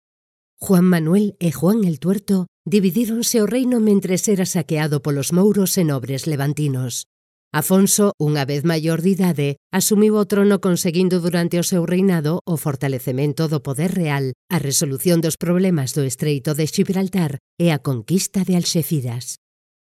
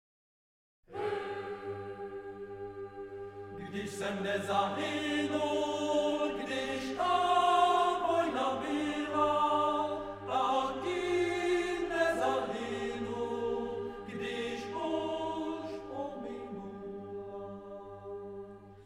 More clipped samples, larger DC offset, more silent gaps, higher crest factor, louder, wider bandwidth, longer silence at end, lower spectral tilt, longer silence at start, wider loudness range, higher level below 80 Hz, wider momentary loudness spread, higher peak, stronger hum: neither; neither; first, 2.48-2.64 s, 7.06-7.51 s, 8.14-8.18 s, 9.57-9.70 s, 12.41-12.45 s, 14.35-14.48 s, 17.40-17.57 s vs none; about the same, 16 dB vs 18 dB; first, -19 LUFS vs -33 LUFS; about the same, 16 kHz vs 15.5 kHz; first, 0.45 s vs 0 s; about the same, -5.5 dB/octave vs -4.5 dB/octave; second, 0.6 s vs 0.9 s; second, 3 LU vs 11 LU; about the same, -60 dBFS vs -62 dBFS; second, 7 LU vs 15 LU; first, -2 dBFS vs -16 dBFS; neither